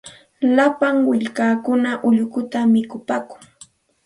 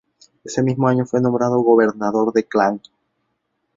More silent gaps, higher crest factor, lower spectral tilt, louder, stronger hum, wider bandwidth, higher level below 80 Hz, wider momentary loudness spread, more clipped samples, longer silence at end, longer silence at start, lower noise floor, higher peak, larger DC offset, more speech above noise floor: neither; about the same, 16 dB vs 18 dB; about the same, -6 dB/octave vs -7 dB/octave; about the same, -19 LUFS vs -18 LUFS; neither; first, 11.5 kHz vs 7.8 kHz; second, -64 dBFS vs -58 dBFS; first, 9 LU vs 6 LU; neither; second, 0.7 s vs 1 s; second, 0.05 s vs 0.45 s; second, -49 dBFS vs -72 dBFS; about the same, -2 dBFS vs -2 dBFS; neither; second, 31 dB vs 55 dB